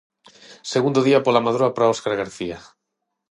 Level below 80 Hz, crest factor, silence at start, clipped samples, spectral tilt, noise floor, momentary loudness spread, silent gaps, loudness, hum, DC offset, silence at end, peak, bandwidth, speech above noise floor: -60 dBFS; 20 dB; 0.5 s; under 0.1%; -5.5 dB/octave; -79 dBFS; 14 LU; none; -20 LUFS; none; under 0.1%; 0.7 s; -2 dBFS; 11 kHz; 59 dB